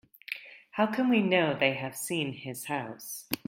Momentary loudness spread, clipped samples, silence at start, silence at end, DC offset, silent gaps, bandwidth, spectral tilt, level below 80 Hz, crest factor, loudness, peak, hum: 15 LU; under 0.1%; 0.3 s; 0.1 s; under 0.1%; none; 16.5 kHz; -4.5 dB/octave; -72 dBFS; 22 dB; -30 LUFS; -8 dBFS; none